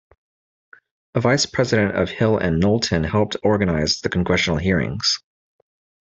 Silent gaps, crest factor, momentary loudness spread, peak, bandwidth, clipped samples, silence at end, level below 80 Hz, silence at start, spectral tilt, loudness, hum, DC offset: none; 18 dB; 3 LU; -4 dBFS; 8.2 kHz; under 0.1%; 0.85 s; -44 dBFS; 1.15 s; -5 dB/octave; -20 LUFS; none; under 0.1%